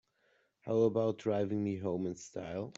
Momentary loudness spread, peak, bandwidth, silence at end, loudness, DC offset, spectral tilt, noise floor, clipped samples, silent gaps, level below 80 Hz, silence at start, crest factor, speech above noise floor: 11 LU; -18 dBFS; 8 kHz; 0.05 s; -34 LUFS; under 0.1%; -7.5 dB/octave; -74 dBFS; under 0.1%; none; -72 dBFS; 0.65 s; 18 dB; 40 dB